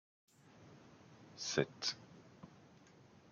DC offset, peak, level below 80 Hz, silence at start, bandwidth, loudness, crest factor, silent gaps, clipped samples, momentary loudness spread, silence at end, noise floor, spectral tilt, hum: under 0.1%; -18 dBFS; -80 dBFS; 0.55 s; 11 kHz; -40 LUFS; 30 dB; none; under 0.1%; 26 LU; 0.3 s; -64 dBFS; -3 dB/octave; none